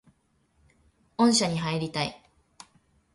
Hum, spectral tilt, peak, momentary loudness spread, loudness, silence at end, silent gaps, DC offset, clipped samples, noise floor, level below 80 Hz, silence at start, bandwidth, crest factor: none; -4 dB/octave; -8 dBFS; 11 LU; -26 LUFS; 1 s; none; under 0.1%; under 0.1%; -69 dBFS; -62 dBFS; 1.2 s; 11.5 kHz; 20 dB